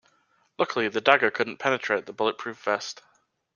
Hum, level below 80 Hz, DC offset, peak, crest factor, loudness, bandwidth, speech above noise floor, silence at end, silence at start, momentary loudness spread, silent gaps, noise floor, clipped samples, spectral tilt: none; -72 dBFS; under 0.1%; -2 dBFS; 26 dB; -25 LUFS; 9.8 kHz; 41 dB; 0.6 s; 0.6 s; 10 LU; none; -67 dBFS; under 0.1%; -3.5 dB/octave